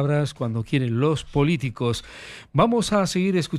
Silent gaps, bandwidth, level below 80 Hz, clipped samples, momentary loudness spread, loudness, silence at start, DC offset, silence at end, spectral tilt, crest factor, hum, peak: none; 13 kHz; -48 dBFS; under 0.1%; 8 LU; -23 LUFS; 0 s; under 0.1%; 0 s; -6 dB/octave; 16 dB; none; -6 dBFS